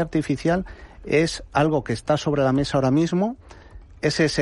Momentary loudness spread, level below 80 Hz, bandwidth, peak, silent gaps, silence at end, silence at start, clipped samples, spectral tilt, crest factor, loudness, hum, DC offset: 7 LU; -44 dBFS; 11.5 kHz; -6 dBFS; none; 0 s; 0 s; under 0.1%; -6 dB/octave; 16 dB; -22 LUFS; none; under 0.1%